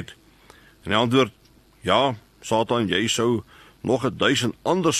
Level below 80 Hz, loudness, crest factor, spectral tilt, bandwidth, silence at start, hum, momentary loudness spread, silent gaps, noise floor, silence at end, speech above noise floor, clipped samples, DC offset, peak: -56 dBFS; -22 LUFS; 18 dB; -4 dB/octave; 13 kHz; 0 s; none; 12 LU; none; -52 dBFS; 0 s; 30 dB; under 0.1%; under 0.1%; -4 dBFS